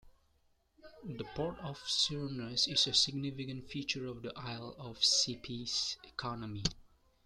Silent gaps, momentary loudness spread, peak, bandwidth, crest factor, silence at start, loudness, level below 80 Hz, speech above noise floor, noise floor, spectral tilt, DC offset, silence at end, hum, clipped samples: none; 16 LU; -16 dBFS; 13.5 kHz; 22 dB; 0.05 s; -34 LUFS; -60 dBFS; 36 dB; -73 dBFS; -2.5 dB/octave; under 0.1%; 0.45 s; none; under 0.1%